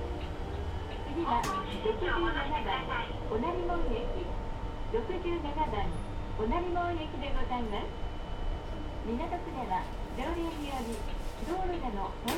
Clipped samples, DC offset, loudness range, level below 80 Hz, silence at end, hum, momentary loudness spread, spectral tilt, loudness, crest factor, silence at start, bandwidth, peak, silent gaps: under 0.1%; under 0.1%; 4 LU; -38 dBFS; 0 s; none; 8 LU; -6 dB/octave; -35 LUFS; 16 dB; 0 s; 17 kHz; -16 dBFS; none